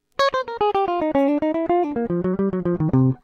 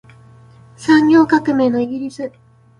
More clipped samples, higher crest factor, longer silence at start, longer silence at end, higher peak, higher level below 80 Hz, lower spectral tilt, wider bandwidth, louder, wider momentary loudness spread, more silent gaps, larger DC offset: neither; about the same, 14 dB vs 16 dB; second, 0.2 s vs 0.8 s; second, 0.05 s vs 0.5 s; second, -8 dBFS vs 0 dBFS; first, -48 dBFS vs -54 dBFS; first, -8 dB/octave vs -6 dB/octave; second, 7.6 kHz vs 10.5 kHz; second, -21 LUFS vs -14 LUFS; second, 3 LU vs 16 LU; neither; neither